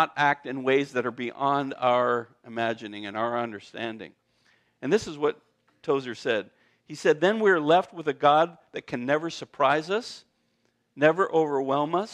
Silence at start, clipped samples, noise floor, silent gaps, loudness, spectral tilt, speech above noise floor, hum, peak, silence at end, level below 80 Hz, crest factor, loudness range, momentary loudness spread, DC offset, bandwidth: 0 s; under 0.1%; -72 dBFS; none; -26 LUFS; -5 dB/octave; 46 dB; none; -6 dBFS; 0 s; -72 dBFS; 20 dB; 6 LU; 14 LU; under 0.1%; 11 kHz